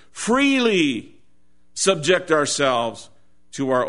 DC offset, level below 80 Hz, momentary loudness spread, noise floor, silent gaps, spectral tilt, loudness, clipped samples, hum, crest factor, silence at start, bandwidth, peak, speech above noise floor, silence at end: 0.5%; -60 dBFS; 15 LU; -65 dBFS; none; -3.5 dB/octave; -20 LUFS; under 0.1%; none; 18 dB; 0.15 s; 11 kHz; -4 dBFS; 45 dB; 0 s